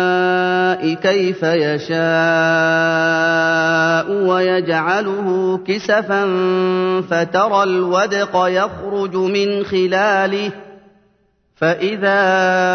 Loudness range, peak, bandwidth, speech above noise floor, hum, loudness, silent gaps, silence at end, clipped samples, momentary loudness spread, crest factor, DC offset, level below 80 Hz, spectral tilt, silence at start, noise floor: 3 LU; -2 dBFS; 6.6 kHz; 44 dB; none; -16 LUFS; none; 0 s; under 0.1%; 5 LU; 14 dB; under 0.1%; -60 dBFS; -5.5 dB/octave; 0 s; -60 dBFS